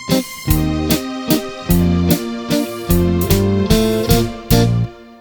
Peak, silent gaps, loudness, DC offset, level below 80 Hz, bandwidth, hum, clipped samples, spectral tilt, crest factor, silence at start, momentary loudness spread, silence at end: 0 dBFS; none; -16 LUFS; under 0.1%; -26 dBFS; over 20 kHz; none; under 0.1%; -5.5 dB/octave; 16 dB; 0 s; 5 LU; 0.05 s